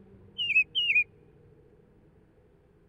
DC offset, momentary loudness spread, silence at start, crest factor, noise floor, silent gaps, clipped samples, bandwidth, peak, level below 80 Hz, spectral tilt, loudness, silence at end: under 0.1%; 11 LU; 0.4 s; 18 dB; -61 dBFS; none; under 0.1%; 9 kHz; -16 dBFS; -66 dBFS; -1.5 dB/octave; -25 LUFS; 1.85 s